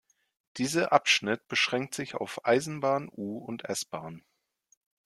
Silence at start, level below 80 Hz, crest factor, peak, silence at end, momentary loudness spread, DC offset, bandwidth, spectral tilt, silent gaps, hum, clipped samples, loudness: 0.55 s; -72 dBFS; 26 dB; -6 dBFS; 0.95 s; 14 LU; under 0.1%; 14 kHz; -3 dB/octave; none; none; under 0.1%; -29 LUFS